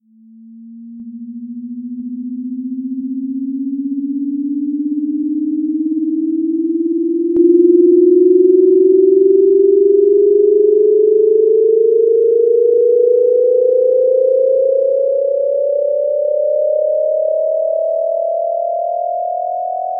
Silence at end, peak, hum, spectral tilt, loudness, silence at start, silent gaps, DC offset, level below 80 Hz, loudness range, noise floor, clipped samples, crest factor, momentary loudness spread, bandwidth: 0 s; 0 dBFS; none; -14.5 dB/octave; -13 LUFS; 0.45 s; none; under 0.1%; -72 dBFS; 11 LU; -42 dBFS; under 0.1%; 12 dB; 13 LU; 0.8 kHz